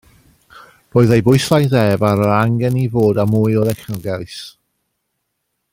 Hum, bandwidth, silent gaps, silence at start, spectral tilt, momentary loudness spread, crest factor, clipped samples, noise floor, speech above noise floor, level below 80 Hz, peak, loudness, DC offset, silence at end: none; 16.5 kHz; none; 0.55 s; -7 dB/octave; 12 LU; 14 dB; under 0.1%; -72 dBFS; 58 dB; -48 dBFS; -2 dBFS; -15 LUFS; under 0.1%; 1.25 s